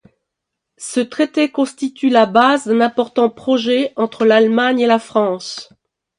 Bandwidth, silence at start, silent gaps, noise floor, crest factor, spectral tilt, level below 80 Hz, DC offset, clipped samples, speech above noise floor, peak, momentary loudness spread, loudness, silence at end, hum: 11.5 kHz; 0.8 s; none; -79 dBFS; 16 dB; -4.5 dB/octave; -66 dBFS; under 0.1%; under 0.1%; 64 dB; 0 dBFS; 9 LU; -15 LUFS; 0.55 s; none